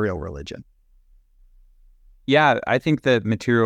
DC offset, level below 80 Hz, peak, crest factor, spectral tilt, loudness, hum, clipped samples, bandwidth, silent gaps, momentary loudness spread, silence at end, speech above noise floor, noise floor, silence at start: under 0.1%; -48 dBFS; -4 dBFS; 18 dB; -6.5 dB/octave; -20 LUFS; none; under 0.1%; 12 kHz; none; 19 LU; 0 s; 35 dB; -55 dBFS; 0 s